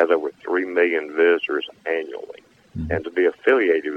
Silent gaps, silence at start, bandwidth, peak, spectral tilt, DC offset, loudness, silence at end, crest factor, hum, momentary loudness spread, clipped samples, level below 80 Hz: none; 0 s; 5.8 kHz; -6 dBFS; -7 dB/octave; under 0.1%; -21 LUFS; 0 s; 16 dB; none; 15 LU; under 0.1%; -48 dBFS